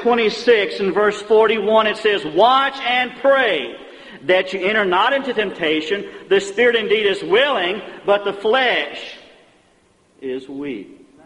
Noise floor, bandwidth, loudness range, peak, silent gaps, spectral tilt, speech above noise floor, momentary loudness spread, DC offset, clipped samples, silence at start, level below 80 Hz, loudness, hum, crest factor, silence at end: -56 dBFS; 10.5 kHz; 5 LU; -2 dBFS; none; -4 dB/octave; 39 dB; 14 LU; under 0.1%; under 0.1%; 0 s; -60 dBFS; -17 LUFS; none; 16 dB; 0.3 s